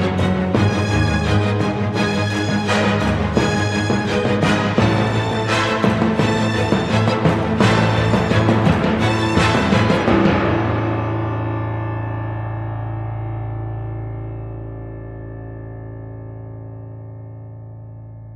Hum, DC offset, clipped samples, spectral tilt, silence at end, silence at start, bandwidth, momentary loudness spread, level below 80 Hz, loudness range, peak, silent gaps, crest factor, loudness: none; under 0.1%; under 0.1%; -6.5 dB/octave; 0 s; 0 s; 11.5 kHz; 18 LU; -38 dBFS; 15 LU; -2 dBFS; none; 18 dB; -18 LUFS